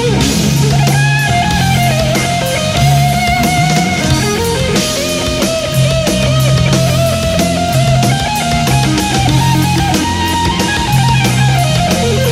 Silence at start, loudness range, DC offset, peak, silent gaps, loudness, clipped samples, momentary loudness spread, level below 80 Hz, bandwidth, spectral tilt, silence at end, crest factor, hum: 0 s; 1 LU; under 0.1%; 0 dBFS; none; -11 LUFS; under 0.1%; 3 LU; -26 dBFS; 16 kHz; -4.5 dB/octave; 0 s; 12 dB; none